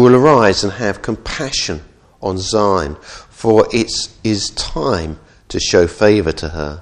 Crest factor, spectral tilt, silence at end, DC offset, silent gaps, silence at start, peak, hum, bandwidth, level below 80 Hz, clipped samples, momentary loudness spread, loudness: 16 dB; -4.5 dB/octave; 0 s; under 0.1%; none; 0 s; 0 dBFS; none; 10.5 kHz; -34 dBFS; 0.1%; 14 LU; -15 LUFS